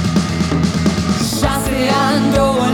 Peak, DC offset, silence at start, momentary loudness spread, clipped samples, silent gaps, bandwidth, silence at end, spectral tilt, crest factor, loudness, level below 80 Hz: -2 dBFS; under 0.1%; 0 s; 3 LU; under 0.1%; none; 19.5 kHz; 0 s; -5 dB/octave; 14 dB; -15 LUFS; -30 dBFS